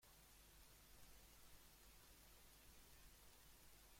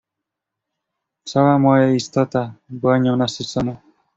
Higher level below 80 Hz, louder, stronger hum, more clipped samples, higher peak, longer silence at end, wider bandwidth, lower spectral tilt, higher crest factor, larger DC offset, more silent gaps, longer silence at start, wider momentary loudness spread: second, -72 dBFS vs -56 dBFS; second, -67 LUFS vs -18 LUFS; neither; neither; second, -50 dBFS vs -2 dBFS; second, 0 s vs 0.4 s; first, 16.5 kHz vs 8 kHz; second, -2 dB/octave vs -6.5 dB/octave; about the same, 18 dB vs 18 dB; neither; neither; second, 0 s vs 1.25 s; second, 1 LU vs 11 LU